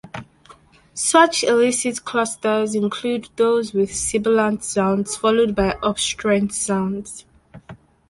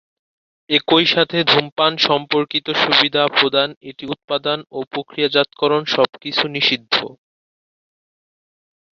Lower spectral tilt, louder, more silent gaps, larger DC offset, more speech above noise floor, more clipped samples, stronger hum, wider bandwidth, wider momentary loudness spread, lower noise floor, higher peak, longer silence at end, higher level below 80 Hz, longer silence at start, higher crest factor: about the same, -3.5 dB/octave vs -4.5 dB/octave; about the same, -19 LUFS vs -17 LUFS; second, none vs 1.72-1.76 s, 3.77-3.81 s, 4.24-4.28 s, 4.87-4.91 s; neither; second, 30 dB vs over 72 dB; neither; neither; first, 11.5 kHz vs 7.2 kHz; second, 9 LU vs 12 LU; second, -49 dBFS vs under -90 dBFS; about the same, -2 dBFS vs 0 dBFS; second, 0.35 s vs 1.85 s; first, -48 dBFS vs -64 dBFS; second, 0.05 s vs 0.7 s; about the same, 18 dB vs 20 dB